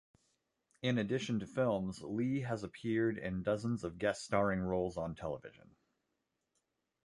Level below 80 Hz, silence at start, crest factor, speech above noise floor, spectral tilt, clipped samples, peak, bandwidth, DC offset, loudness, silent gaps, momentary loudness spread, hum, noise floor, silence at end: -62 dBFS; 0.85 s; 20 dB; 49 dB; -6.5 dB/octave; under 0.1%; -16 dBFS; 11.5 kHz; under 0.1%; -37 LUFS; none; 7 LU; none; -85 dBFS; 1.55 s